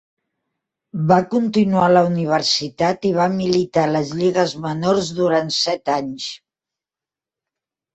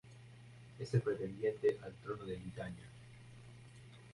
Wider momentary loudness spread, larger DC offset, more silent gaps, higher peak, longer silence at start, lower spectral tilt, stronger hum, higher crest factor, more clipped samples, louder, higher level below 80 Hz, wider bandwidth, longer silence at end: second, 8 LU vs 21 LU; neither; neither; first, -2 dBFS vs -22 dBFS; first, 0.95 s vs 0.05 s; second, -5.5 dB/octave vs -7.5 dB/octave; neither; about the same, 18 dB vs 20 dB; neither; first, -18 LUFS vs -40 LUFS; first, -56 dBFS vs -66 dBFS; second, 8.2 kHz vs 11.5 kHz; first, 1.6 s vs 0 s